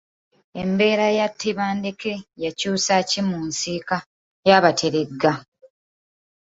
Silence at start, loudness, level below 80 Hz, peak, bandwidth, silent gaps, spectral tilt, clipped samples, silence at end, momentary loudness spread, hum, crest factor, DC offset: 0.55 s; -21 LUFS; -60 dBFS; -2 dBFS; 8 kHz; 4.06-4.43 s; -4 dB/octave; under 0.1%; 1.05 s; 13 LU; none; 20 dB; under 0.1%